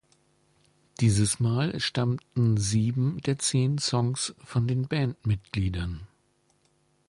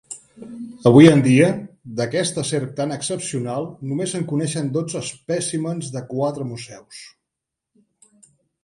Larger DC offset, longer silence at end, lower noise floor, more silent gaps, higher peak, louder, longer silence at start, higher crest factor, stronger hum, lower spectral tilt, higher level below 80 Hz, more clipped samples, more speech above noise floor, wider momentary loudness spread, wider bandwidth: neither; second, 1.05 s vs 1.55 s; second, -68 dBFS vs -83 dBFS; neither; second, -10 dBFS vs 0 dBFS; second, -27 LUFS vs -19 LUFS; first, 1 s vs 0.1 s; about the same, 16 dB vs 20 dB; neither; about the same, -5 dB/octave vs -6 dB/octave; first, -46 dBFS vs -58 dBFS; neither; second, 42 dB vs 64 dB; second, 6 LU vs 23 LU; about the same, 11.5 kHz vs 11.5 kHz